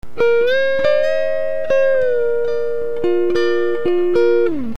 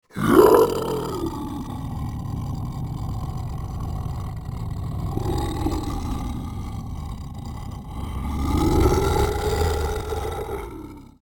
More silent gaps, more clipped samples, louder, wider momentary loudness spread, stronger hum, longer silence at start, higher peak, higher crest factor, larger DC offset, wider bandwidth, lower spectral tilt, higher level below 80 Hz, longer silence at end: neither; neither; first, -17 LUFS vs -25 LUFS; second, 5 LU vs 15 LU; first, 60 Hz at -50 dBFS vs none; about the same, 0.15 s vs 0.15 s; second, -6 dBFS vs -2 dBFS; second, 12 dB vs 22 dB; first, 8% vs under 0.1%; second, 7.6 kHz vs over 20 kHz; about the same, -6 dB/octave vs -6.5 dB/octave; second, -50 dBFS vs -32 dBFS; second, 0 s vs 0.15 s